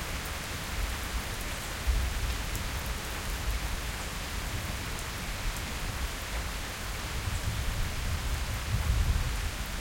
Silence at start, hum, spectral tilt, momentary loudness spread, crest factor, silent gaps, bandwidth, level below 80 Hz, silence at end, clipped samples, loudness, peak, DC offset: 0 s; none; -3.5 dB/octave; 4 LU; 16 dB; none; 17 kHz; -34 dBFS; 0 s; under 0.1%; -34 LUFS; -16 dBFS; under 0.1%